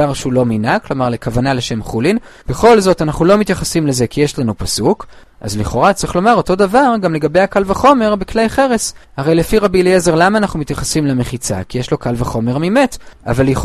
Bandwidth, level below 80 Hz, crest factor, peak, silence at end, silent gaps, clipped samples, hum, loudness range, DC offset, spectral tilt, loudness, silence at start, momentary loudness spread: 14.5 kHz; -32 dBFS; 14 dB; 0 dBFS; 0 s; none; under 0.1%; none; 2 LU; under 0.1%; -5.5 dB/octave; -14 LUFS; 0 s; 9 LU